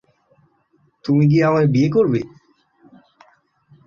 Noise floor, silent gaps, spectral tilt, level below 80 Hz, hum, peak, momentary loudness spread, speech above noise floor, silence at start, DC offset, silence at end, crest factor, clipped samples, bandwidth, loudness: -61 dBFS; none; -9 dB/octave; -58 dBFS; none; -6 dBFS; 13 LU; 46 dB; 1.05 s; under 0.1%; 1.6 s; 14 dB; under 0.1%; 7 kHz; -17 LUFS